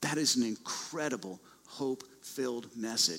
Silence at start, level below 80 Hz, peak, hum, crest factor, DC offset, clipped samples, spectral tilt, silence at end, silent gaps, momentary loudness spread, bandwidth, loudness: 0 s; -78 dBFS; -14 dBFS; none; 22 dB; under 0.1%; under 0.1%; -2.5 dB/octave; 0 s; none; 16 LU; 16 kHz; -34 LUFS